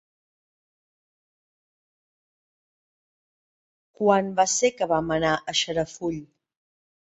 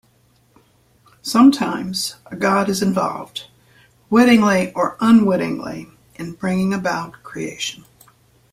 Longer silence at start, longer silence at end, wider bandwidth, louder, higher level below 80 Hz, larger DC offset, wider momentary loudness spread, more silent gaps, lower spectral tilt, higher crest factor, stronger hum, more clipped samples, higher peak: first, 4 s vs 1.25 s; first, 0.95 s vs 0.75 s; second, 8.2 kHz vs 15.5 kHz; second, -24 LUFS vs -18 LUFS; about the same, -60 dBFS vs -56 dBFS; neither; second, 10 LU vs 18 LU; neither; second, -3 dB/octave vs -5 dB/octave; about the same, 22 dB vs 18 dB; neither; neither; second, -6 dBFS vs -2 dBFS